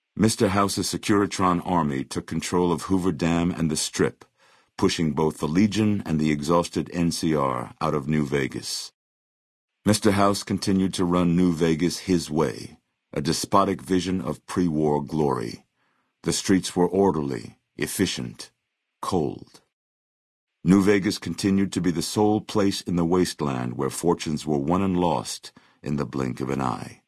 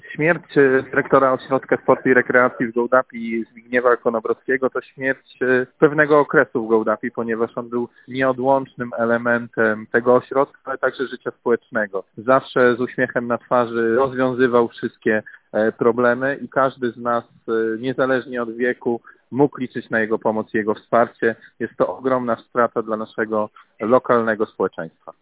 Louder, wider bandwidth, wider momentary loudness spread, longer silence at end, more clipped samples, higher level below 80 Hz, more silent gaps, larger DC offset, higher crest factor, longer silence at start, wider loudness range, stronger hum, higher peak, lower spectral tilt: second, -24 LUFS vs -20 LUFS; first, 12 kHz vs 4 kHz; about the same, 9 LU vs 10 LU; about the same, 0.15 s vs 0.1 s; neither; first, -52 dBFS vs -62 dBFS; first, 8.94-9.68 s, 19.73-20.47 s vs none; neither; about the same, 20 dB vs 20 dB; about the same, 0.15 s vs 0.05 s; about the same, 3 LU vs 3 LU; neither; second, -4 dBFS vs 0 dBFS; second, -5.5 dB/octave vs -10 dB/octave